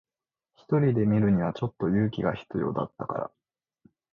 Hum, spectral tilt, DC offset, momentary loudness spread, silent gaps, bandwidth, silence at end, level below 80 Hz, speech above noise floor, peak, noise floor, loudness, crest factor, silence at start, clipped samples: none; -10 dB/octave; under 0.1%; 10 LU; none; 5.2 kHz; 0.85 s; -56 dBFS; 63 dB; -12 dBFS; -89 dBFS; -27 LUFS; 16 dB; 0.7 s; under 0.1%